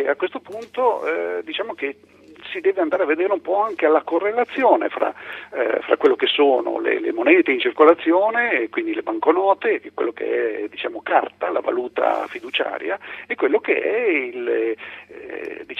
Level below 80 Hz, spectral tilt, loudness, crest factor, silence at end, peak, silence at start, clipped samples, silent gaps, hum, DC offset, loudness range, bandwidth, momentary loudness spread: -72 dBFS; -5 dB/octave; -20 LUFS; 20 dB; 0 s; 0 dBFS; 0 s; under 0.1%; none; none; under 0.1%; 6 LU; 6 kHz; 13 LU